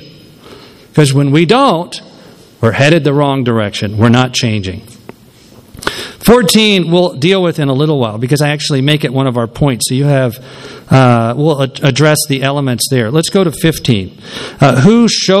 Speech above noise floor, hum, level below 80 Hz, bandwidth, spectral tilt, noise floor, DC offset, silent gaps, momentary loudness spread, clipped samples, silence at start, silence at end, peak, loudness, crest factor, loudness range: 29 dB; none; -40 dBFS; 15 kHz; -5.5 dB/octave; -40 dBFS; under 0.1%; none; 11 LU; 0.6%; 0 s; 0 s; 0 dBFS; -11 LUFS; 12 dB; 2 LU